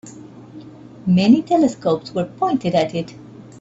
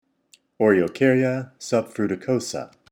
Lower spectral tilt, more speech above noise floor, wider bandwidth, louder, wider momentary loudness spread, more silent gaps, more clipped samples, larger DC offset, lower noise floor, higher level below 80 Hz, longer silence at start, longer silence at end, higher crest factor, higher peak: about the same, -7 dB/octave vs -6 dB/octave; second, 22 dB vs 38 dB; second, 8 kHz vs 16 kHz; first, -18 LUFS vs -22 LUFS; first, 25 LU vs 10 LU; neither; neither; neither; second, -39 dBFS vs -60 dBFS; first, -58 dBFS vs -66 dBFS; second, 0.05 s vs 0.6 s; about the same, 0.2 s vs 0.25 s; about the same, 16 dB vs 18 dB; about the same, -2 dBFS vs -4 dBFS